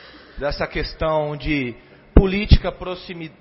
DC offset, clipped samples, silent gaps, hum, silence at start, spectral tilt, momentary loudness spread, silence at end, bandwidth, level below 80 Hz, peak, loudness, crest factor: under 0.1%; under 0.1%; none; none; 0 s; -10.5 dB/octave; 14 LU; 0.1 s; 5.8 kHz; -24 dBFS; 0 dBFS; -21 LUFS; 20 dB